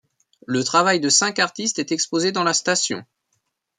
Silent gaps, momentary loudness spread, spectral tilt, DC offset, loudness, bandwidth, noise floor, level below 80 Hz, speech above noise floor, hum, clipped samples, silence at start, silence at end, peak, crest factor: none; 8 LU; -2 dB/octave; under 0.1%; -19 LUFS; 11 kHz; -73 dBFS; -70 dBFS; 52 dB; none; under 0.1%; 0.5 s; 0.75 s; -4 dBFS; 18 dB